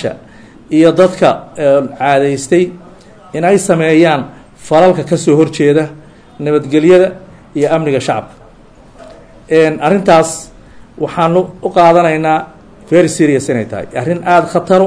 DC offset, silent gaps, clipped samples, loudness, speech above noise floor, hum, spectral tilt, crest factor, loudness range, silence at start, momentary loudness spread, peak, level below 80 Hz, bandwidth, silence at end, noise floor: under 0.1%; none; 0.3%; -11 LUFS; 30 dB; none; -6 dB/octave; 12 dB; 3 LU; 0 s; 11 LU; 0 dBFS; -46 dBFS; 11 kHz; 0 s; -40 dBFS